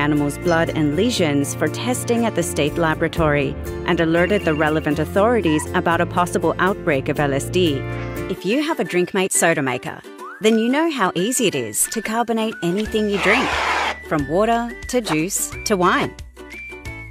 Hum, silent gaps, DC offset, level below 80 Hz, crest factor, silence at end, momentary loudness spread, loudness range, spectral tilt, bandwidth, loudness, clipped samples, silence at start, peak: none; none; under 0.1%; -40 dBFS; 18 dB; 0 s; 8 LU; 2 LU; -4.5 dB/octave; 16 kHz; -19 LUFS; under 0.1%; 0 s; -2 dBFS